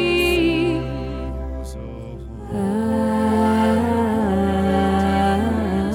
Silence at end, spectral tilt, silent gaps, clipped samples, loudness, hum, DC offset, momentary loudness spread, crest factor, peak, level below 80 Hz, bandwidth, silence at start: 0 s; -6.5 dB/octave; none; under 0.1%; -20 LUFS; none; under 0.1%; 14 LU; 12 dB; -8 dBFS; -34 dBFS; 16.5 kHz; 0 s